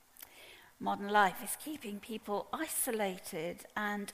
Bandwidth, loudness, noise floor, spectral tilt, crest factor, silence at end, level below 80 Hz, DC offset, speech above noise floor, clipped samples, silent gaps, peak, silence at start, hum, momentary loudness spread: 15.5 kHz; -36 LUFS; -57 dBFS; -3 dB/octave; 22 dB; 0 s; -72 dBFS; under 0.1%; 21 dB; under 0.1%; none; -14 dBFS; 0.25 s; none; 22 LU